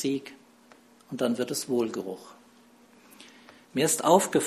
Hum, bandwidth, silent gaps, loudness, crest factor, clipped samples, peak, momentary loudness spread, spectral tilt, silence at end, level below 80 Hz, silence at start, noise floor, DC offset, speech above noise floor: none; 14 kHz; none; -27 LUFS; 24 dB; under 0.1%; -6 dBFS; 24 LU; -4 dB/octave; 0 s; -72 dBFS; 0 s; -57 dBFS; under 0.1%; 31 dB